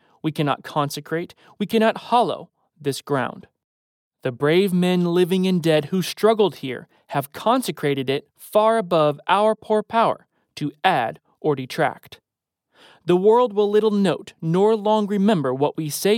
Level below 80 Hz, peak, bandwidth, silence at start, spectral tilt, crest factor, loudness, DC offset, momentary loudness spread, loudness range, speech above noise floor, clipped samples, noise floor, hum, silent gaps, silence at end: -70 dBFS; -4 dBFS; 17.5 kHz; 0.25 s; -6 dB/octave; 16 dB; -21 LUFS; under 0.1%; 12 LU; 4 LU; 61 dB; under 0.1%; -81 dBFS; none; 3.64-4.11 s; 0 s